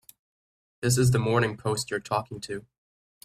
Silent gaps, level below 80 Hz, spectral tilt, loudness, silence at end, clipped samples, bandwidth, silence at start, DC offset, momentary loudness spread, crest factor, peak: none; -54 dBFS; -5 dB/octave; -26 LUFS; 0.65 s; under 0.1%; 15 kHz; 0.8 s; under 0.1%; 14 LU; 20 dB; -8 dBFS